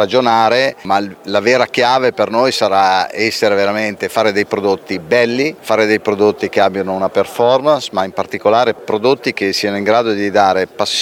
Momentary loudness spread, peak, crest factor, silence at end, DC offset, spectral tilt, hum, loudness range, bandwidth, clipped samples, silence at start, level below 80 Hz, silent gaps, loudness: 5 LU; 0 dBFS; 14 dB; 0 s; under 0.1%; -4 dB/octave; none; 1 LU; 16.5 kHz; under 0.1%; 0 s; -60 dBFS; none; -14 LUFS